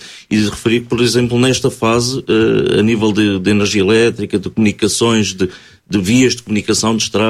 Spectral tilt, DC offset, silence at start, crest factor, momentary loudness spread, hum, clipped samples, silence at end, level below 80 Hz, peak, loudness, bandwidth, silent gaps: -4.5 dB/octave; under 0.1%; 0 s; 12 dB; 6 LU; none; under 0.1%; 0 s; -44 dBFS; 0 dBFS; -14 LUFS; 15 kHz; none